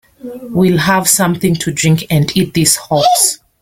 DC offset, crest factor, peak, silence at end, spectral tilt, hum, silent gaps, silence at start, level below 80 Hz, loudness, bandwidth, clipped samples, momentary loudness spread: under 0.1%; 12 dB; 0 dBFS; 0.25 s; -4 dB/octave; none; none; 0.25 s; -44 dBFS; -12 LUFS; 17 kHz; under 0.1%; 5 LU